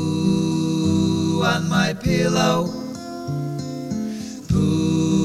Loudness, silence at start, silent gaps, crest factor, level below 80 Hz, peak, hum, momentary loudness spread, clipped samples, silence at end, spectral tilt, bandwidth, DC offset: -21 LUFS; 0 s; none; 16 dB; -42 dBFS; -4 dBFS; none; 10 LU; under 0.1%; 0 s; -6 dB/octave; 14 kHz; under 0.1%